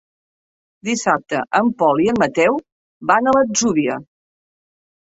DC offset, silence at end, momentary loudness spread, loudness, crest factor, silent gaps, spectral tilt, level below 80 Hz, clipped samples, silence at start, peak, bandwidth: under 0.1%; 1.05 s; 10 LU; -17 LUFS; 18 dB; 2.72-3.01 s; -4 dB/octave; -58 dBFS; under 0.1%; 0.85 s; -2 dBFS; 8 kHz